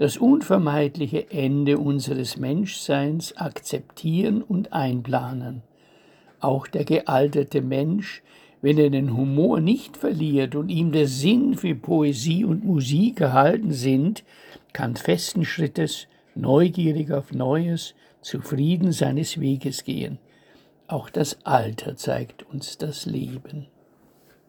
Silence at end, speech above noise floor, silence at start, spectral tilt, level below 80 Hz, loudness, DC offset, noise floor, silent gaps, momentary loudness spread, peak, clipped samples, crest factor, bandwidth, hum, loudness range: 0.85 s; 35 dB; 0 s; -6.5 dB/octave; -62 dBFS; -23 LUFS; under 0.1%; -57 dBFS; none; 13 LU; -2 dBFS; under 0.1%; 20 dB; 20 kHz; none; 6 LU